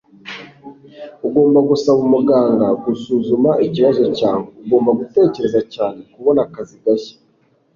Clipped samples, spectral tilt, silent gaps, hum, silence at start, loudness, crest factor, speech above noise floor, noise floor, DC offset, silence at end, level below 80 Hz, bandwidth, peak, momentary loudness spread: under 0.1%; -7.5 dB/octave; none; none; 0.25 s; -16 LUFS; 14 dB; 43 dB; -58 dBFS; under 0.1%; 0.65 s; -56 dBFS; 7.2 kHz; -2 dBFS; 14 LU